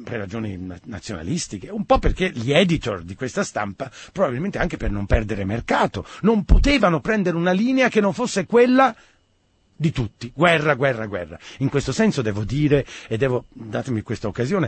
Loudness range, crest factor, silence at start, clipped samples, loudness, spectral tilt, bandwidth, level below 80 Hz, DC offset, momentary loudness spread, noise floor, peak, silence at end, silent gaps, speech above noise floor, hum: 4 LU; 20 dB; 0 s; under 0.1%; -21 LUFS; -6 dB/octave; 8.8 kHz; -30 dBFS; under 0.1%; 12 LU; -63 dBFS; -2 dBFS; 0 s; none; 42 dB; none